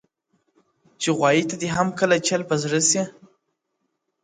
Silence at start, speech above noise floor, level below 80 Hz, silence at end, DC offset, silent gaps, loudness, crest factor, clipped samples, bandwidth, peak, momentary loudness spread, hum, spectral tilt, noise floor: 1 s; 55 dB; -62 dBFS; 1.15 s; under 0.1%; none; -21 LUFS; 18 dB; under 0.1%; 9.6 kHz; -6 dBFS; 6 LU; none; -3.5 dB/octave; -76 dBFS